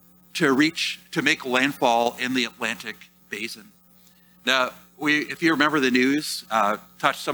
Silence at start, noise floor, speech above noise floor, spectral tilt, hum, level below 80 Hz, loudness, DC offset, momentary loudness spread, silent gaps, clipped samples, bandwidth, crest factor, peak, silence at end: 0.35 s; -55 dBFS; 32 dB; -3.5 dB/octave; none; -68 dBFS; -23 LUFS; under 0.1%; 13 LU; none; under 0.1%; over 20 kHz; 22 dB; -2 dBFS; 0 s